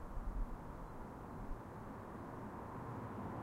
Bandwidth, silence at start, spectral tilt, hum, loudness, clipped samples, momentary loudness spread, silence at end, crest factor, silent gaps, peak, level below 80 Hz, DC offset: 15.5 kHz; 0 s; -8 dB/octave; none; -49 LUFS; under 0.1%; 4 LU; 0 s; 14 dB; none; -32 dBFS; -50 dBFS; under 0.1%